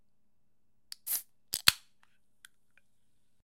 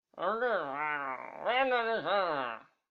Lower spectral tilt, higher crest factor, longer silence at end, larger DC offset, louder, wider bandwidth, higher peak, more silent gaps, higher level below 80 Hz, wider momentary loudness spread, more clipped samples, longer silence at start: second, 1 dB/octave vs -5.5 dB/octave; first, 36 dB vs 18 dB; first, 1.65 s vs 0.3 s; neither; about the same, -30 LUFS vs -32 LUFS; first, 16.5 kHz vs 6.2 kHz; first, -2 dBFS vs -16 dBFS; neither; about the same, -70 dBFS vs -74 dBFS; first, 19 LU vs 9 LU; neither; first, 1.05 s vs 0.15 s